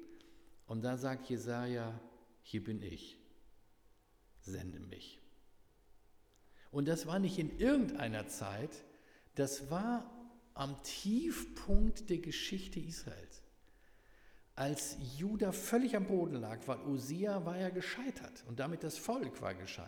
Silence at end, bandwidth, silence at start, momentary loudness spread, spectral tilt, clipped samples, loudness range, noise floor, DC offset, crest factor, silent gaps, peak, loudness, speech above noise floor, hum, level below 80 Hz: 0 s; over 20 kHz; 0 s; 16 LU; -5.5 dB/octave; under 0.1%; 11 LU; -68 dBFS; under 0.1%; 24 dB; none; -16 dBFS; -39 LUFS; 30 dB; none; -50 dBFS